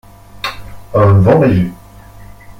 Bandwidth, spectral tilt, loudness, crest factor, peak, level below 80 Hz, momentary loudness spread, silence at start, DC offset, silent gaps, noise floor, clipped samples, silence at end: 15 kHz; -8.5 dB/octave; -12 LUFS; 12 dB; -2 dBFS; -36 dBFS; 15 LU; 0.35 s; under 0.1%; none; -36 dBFS; under 0.1%; 0.1 s